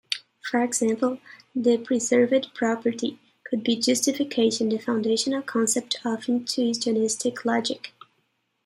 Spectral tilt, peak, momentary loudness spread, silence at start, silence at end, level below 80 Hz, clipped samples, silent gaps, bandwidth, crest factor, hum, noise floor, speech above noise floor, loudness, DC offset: -3 dB/octave; -8 dBFS; 9 LU; 0.1 s; 0.75 s; -72 dBFS; under 0.1%; none; 15.5 kHz; 18 dB; none; -72 dBFS; 48 dB; -24 LUFS; under 0.1%